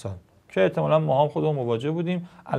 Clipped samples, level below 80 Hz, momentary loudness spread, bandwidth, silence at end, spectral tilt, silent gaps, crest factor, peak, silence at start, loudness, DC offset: under 0.1%; -64 dBFS; 11 LU; 9 kHz; 0 s; -8 dB/octave; none; 18 dB; -8 dBFS; 0 s; -24 LUFS; under 0.1%